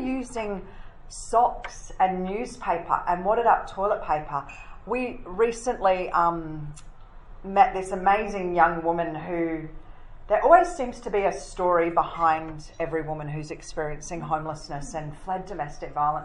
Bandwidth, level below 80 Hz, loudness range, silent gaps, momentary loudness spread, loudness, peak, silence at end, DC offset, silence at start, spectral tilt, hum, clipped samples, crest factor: 11 kHz; -44 dBFS; 5 LU; none; 14 LU; -25 LUFS; -4 dBFS; 0 s; under 0.1%; 0 s; -5.5 dB/octave; none; under 0.1%; 22 dB